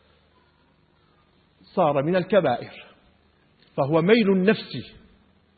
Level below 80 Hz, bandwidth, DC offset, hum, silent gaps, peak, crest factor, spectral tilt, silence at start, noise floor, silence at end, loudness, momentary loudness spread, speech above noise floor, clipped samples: -62 dBFS; 4.8 kHz; under 0.1%; none; none; -4 dBFS; 22 dB; -11 dB/octave; 1.75 s; -62 dBFS; 0.7 s; -22 LUFS; 18 LU; 40 dB; under 0.1%